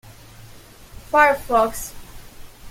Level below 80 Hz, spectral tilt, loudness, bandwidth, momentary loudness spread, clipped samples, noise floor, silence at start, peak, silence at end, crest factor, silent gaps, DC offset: -44 dBFS; -3.5 dB/octave; -18 LUFS; 16.5 kHz; 17 LU; under 0.1%; -43 dBFS; 0.05 s; -2 dBFS; 0 s; 20 dB; none; under 0.1%